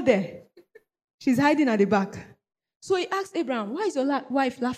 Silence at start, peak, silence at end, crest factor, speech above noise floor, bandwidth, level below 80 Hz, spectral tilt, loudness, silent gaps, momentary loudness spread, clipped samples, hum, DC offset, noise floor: 0 s; -8 dBFS; 0 s; 18 dB; 32 dB; 14.5 kHz; -66 dBFS; -6 dB/octave; -25 LUFS; 1.04-1.08 s, 1.14-1.18 s, 2.76-2.80 s; 9 LU; under 0.1%; none; under 0.1%; -56 dBFS